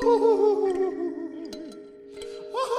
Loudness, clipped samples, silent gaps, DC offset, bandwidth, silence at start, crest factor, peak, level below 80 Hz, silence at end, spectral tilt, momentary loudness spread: -25 LUFS; under 0.1%; none; under 0.1%; 12 kHz; 0 s; 14 dB; -10 dBFS; -60 dBFS; 0 s; -4.5 dB/octave; 21 LU